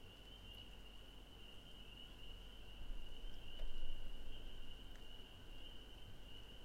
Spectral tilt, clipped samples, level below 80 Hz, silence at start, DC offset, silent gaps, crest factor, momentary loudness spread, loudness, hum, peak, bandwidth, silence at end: -4 dB/octave; under 0.1%; -50 dBFS; 0 s; under 0.1%; none; 16 dB; 5 LU; -57 LUFS; none; -30 dBFS; 8 kHz; 0 s